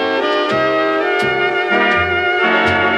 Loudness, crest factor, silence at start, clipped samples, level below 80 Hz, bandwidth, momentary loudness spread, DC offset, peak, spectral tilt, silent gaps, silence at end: -14 LUFS; 12 dB; 0 s; under 0.1%; -52 dBFS; 12 kHz; 3 LU; under 0.1%; -2 dBFS; -5 dB/octave; none; 0 s